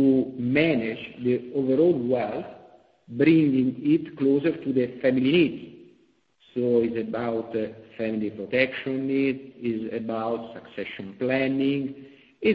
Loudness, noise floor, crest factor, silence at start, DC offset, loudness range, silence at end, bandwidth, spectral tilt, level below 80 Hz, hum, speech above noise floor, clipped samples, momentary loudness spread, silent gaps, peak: -25 LUFS; -63 dBFS; 18 dB; 0 s; under 0.1%; 5 LU; 0 s; 5 kHz; -9.5 dB/octave; -64 dBFS; none; 39 dB; under 0.1%; 14 LU; none; -8 dBFS